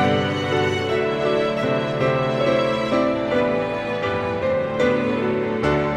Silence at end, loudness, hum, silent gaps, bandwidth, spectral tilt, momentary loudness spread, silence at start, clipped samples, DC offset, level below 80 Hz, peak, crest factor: 0 s; -21 LUFS; none; none; 11 kHz; -6.5 dB/octave; 3 LU; 0 s; under 0.1%; under 0.1%; -46 dBFS; -6 dBFS; 14 dB